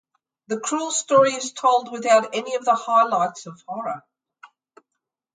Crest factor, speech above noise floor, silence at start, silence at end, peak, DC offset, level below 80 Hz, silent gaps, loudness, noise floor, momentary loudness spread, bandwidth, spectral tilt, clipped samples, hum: 18 dB; 61 dB; 0.5 s; 0.9 s; -4 dBFS; under 0.1%; -78 dBFS; none; -21 LUFS; -82 dBFS; 14 LU; 9.6 kHz; -2.5 dB/octave; under 0.1%; none